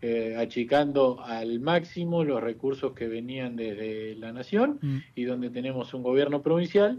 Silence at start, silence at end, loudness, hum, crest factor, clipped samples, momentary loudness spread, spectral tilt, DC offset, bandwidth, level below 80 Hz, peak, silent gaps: 0 s; 0 s; -28 LUFS; none; 16 dB; under 0.1%; 10 LU; -8 dB/octave; under 0.1%; 7.2 kHz; -66 dBFS; -12 dBFS; none